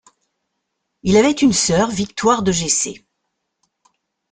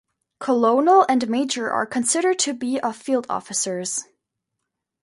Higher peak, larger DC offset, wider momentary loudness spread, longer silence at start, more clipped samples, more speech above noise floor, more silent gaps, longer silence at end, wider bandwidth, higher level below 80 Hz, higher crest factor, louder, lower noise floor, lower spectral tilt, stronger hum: about the same, -2 dBFS vs -4 dBFS; neither; second, 6 LU vs 10 LU; first, 1.05 s vs 0.4 s; neither; about the same, 59 dB vs 60 dB; neither; first, 1.35 s vs 1 s; second, 9.8 kHz vs 11.5 kHz; first, -48 dBFS vs -70 dBFS; about the same, 18 dB vs 18 dB; first, -16 LUFS vs -21 LUFS; second, -75 dBFS vs -81 dBFS; first, -4 dB/octave vs -2.5 dB/octave; neither